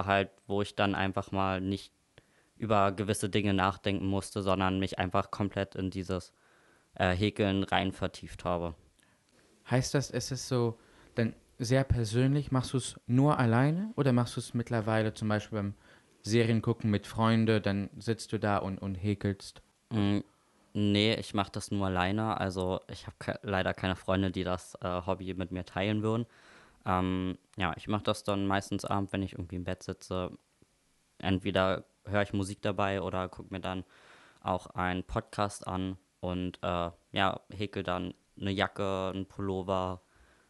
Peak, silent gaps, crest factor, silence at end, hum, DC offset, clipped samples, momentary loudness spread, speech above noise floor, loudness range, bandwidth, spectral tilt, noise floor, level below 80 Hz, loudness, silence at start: -10 dBFS; none; 22 dB; 0.5 s; none; under 0.1%; under 0.1%; 10 LU; 40 dB; 5 LU; 12 kHz; -6 dB/octave; -71 dBFS; -56 dBFS; -32 LUFS; 0 s